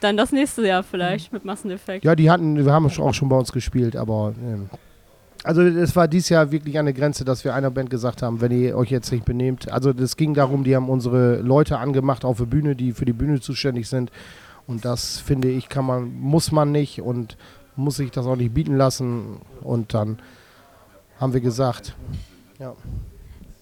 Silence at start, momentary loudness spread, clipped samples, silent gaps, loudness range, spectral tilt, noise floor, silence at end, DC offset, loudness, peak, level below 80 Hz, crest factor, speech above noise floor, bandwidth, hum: 0 s; 14 LU; under 0.1%; none; 5 LU; -6.5 dB/octave; -51 dBFS; 0.1 s; under 0.1%; -21 LUFS; -4 dBFS; -42 dBFS; 18 dB; 31 dB; 15.5 kHz; none